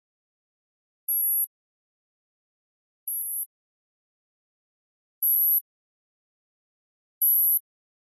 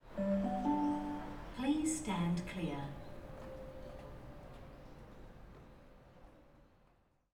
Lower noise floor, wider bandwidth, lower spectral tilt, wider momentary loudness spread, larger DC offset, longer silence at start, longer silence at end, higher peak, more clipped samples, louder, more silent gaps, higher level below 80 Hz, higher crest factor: first, under -90 dBFS vs -71 dBFS; second, 13 kHz vs 15 kHz; second, 6.5 dB/octave vs -6 dB/octave; second, 13 LU vs 22 LU; neither; first, 1.1 s vs 0.05 s; second, 0.45 s vs 0.7 s; first, -14 dBFS vs -24 dBFS; neither; first, -22 LUFS vs -39 LUFS; first, 1.47-3.07 s, 3.46-5.22 s, 5.61-7.21 s vs none; second, under -90 dBFS vs -56 dBFS; about the same, 16 dB vs 18 dB